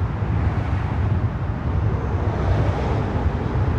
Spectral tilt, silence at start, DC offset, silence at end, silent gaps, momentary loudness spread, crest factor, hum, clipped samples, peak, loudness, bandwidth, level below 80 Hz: -9 dB/octave; 0 s; under 0.1%; 0 s; none; 3 LU; 12 dB; none; under 0.1%; -8 dBFS; -23 LUFS; 7 kHz; -28 dBFS